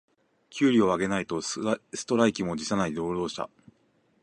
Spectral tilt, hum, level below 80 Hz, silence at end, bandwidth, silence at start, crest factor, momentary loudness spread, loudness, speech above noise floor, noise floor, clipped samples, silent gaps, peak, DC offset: -5 dB/octave; none; -60 dBFS; 0.75 s; 11 kHz; 0.5 s; 22 dB; 10 LU; -27 LUFS; 41 dB; -67 dBFS; under 0.1%; none; -6 dBFS; under 0.1%